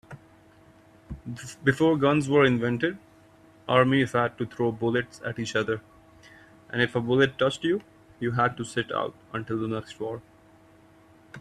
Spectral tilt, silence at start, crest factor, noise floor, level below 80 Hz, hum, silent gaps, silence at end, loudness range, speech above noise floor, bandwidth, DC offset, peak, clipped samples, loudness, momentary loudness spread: -6 dB/octave; 0.1 s; 22 dB; -55 dBFS; -58 dBFS; none; none; 0 s; 6 LU; 30 dB; 13 kHz; under 0.1%; -6 dBFS; under 0.1%; -26 LUFS; 15 LU